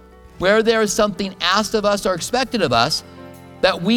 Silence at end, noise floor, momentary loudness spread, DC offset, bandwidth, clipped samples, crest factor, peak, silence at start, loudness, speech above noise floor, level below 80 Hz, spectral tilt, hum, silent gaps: 0 s; -39 dBFS; 5 LU; under 0.1%; 19 kHz; under 0.1%; 18 dB; 0 dBFS; 0.4 s; -18 LUFS; 21 dB; -46 dBFS; -3.5 dB/octave; none; none